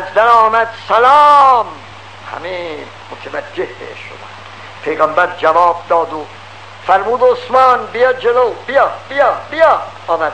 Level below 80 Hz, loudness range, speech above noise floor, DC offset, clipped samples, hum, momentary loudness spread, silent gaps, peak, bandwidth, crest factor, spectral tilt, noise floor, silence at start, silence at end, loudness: -56 dBFS; 9 LU; 21 dB; 0.6%; 0.6%; none; 22 LU; none; 0 dBFS; 10.5 kHz; 14 dB; -4.5 dB/octave; -33 dBFS; 0 s; 0 s; -12 LUFS